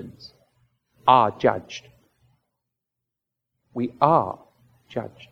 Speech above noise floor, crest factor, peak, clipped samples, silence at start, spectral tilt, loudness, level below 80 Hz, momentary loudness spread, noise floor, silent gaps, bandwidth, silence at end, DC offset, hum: 63 dB; 24 dB; -2 dBFS; under 0.1%; 0 s; -6.5 dB/octave; -22 LUFS; -66 dBFS; 21 LU; -84 dBFS; none; 7.4 kHz; 0.25 s; under 0.1%; none